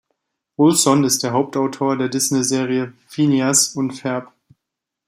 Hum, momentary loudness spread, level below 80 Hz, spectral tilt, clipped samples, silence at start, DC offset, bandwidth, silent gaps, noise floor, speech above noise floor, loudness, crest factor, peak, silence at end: none; 11 LU; -64 dBFS; -4 dB/octave; under 0.1%; 0.6 s; under 0.1%; 16 kHz; none; -82 dBFS; 64 dB; -18 LUFS; 18 dB; -2 dBFS; 0.85 s